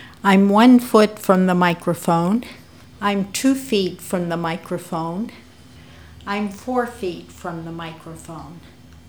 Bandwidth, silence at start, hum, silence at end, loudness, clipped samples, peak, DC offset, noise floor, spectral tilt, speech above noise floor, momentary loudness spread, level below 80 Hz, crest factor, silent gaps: over 20 kHz; 0 s; none; 0.5 s; -19 LUFS; under 0.1%; 0 dBFS; 0.2%; -45 dBFS; -6 dB/octave; 26 dB; 21 LU; -52 dBFS; 20 dB; none